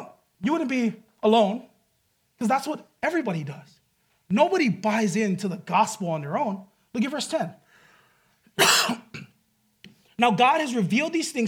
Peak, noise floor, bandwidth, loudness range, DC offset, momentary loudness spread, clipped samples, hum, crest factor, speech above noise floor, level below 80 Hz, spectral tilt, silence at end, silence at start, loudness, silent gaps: -6 dBFS; -70 dBFS; 18.5 kHz; 4 LU; under 0.1%; 15 LU; under 0.1%; none; 20 dB; 46 dB; -74 dBFS; -4 dB/octave; 0 s; 0 s; -24 LUFS; none